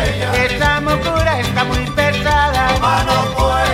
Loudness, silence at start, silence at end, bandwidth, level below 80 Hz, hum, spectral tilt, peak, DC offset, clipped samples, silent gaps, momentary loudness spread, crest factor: -15 LUFS; 0 s; 0 s; 16.5 kHz; -24 dBFS; none; -4.5 dB/octave; -2 dBFS; under 0.1%; under 0.1%; none; 3 LU; 14 dB